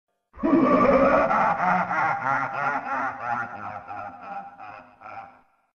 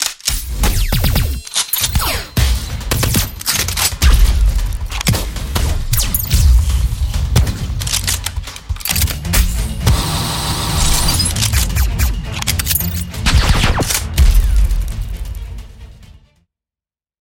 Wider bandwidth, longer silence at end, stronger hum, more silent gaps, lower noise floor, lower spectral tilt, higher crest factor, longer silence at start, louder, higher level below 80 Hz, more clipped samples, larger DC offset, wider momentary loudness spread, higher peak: second, 6.8 kHz vs 17 kHz; second, 0.5 s vs 1.1 s; neither; neither; second, -52 dBFS vs under -90 dBFS; first, -7.5 dB/octave vs -3 dB/octave; about the same, 16 dB vs 16 dB; first, 0.35 s vs 0 s; second, -22 LUFS vs -16 LUFS; second, -52 dBFS vs -18 dBFS; neither; neither; first, 23 LU vs 8 LU; second, -8 dBFS vs 0 dBFS